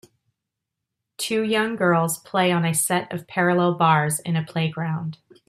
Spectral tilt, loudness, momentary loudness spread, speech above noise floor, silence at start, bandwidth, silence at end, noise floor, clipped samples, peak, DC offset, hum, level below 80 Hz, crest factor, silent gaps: -4.5 dB/octave; -22 LUFS; 9 LU; 61 dB; 1.2 s; 15.5 kHz; 0.35 s; -83 dBFS; under 0.1%; -4 dBFS; under 0.1%; none; -66 dBFS; 18 dB; none